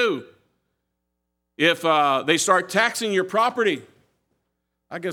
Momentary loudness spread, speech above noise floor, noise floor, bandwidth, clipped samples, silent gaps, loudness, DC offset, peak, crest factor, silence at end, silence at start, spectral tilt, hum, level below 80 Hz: 13 LU; 57 dB; -78 dBFS; 18 kHz; under 0.1%; none; -21 LUFS; under 0.1%; -2 dBFS; 22 dB; 0 s; 0 s; -3 dB/octave; none; -78 dBFS